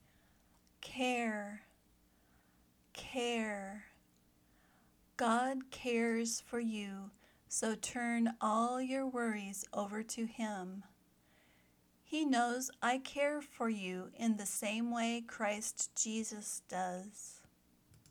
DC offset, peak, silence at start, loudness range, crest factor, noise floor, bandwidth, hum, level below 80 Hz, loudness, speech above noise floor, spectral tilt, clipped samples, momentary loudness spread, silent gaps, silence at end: under 0.1%; -22 dBFS; 0.8 s; 6 LU; 18 dB; -71 dBFS; 19 kHz; none; -76 dBFS; -38 LUFS; 33 dB; -3 dB/octave; under 0.1%; 15 LU; none; 0.7 s